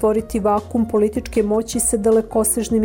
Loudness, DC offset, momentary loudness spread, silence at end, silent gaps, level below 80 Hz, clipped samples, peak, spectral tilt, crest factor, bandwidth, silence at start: -18 LUFS; under 0.1%; 3 LU; 0 s; none; -38 dBFS; under 0.1%; -6 dBFS; -5 dB/octave; 12 dB; 18 kHz; 0 s